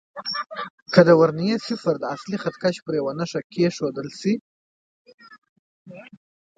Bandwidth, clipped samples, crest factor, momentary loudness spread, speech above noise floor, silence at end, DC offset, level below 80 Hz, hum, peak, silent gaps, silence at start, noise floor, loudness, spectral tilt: 9 kHz; under 0.1%; 22 dB; 13 LU; over 69 dB; 0.55 s; under 0.1%; -66 dBFS; none; 0 dBFS; 0.70-0.86 s, 2.82-2.86 s, 3.44-3.50 s, 4.41-5.05 s, 5.14-5.18 s, 5.38-5.42 s, 5.49-5.86 s; 0.15 s; under -90 dBFS; -22 LUFS; -6.5 dB/octave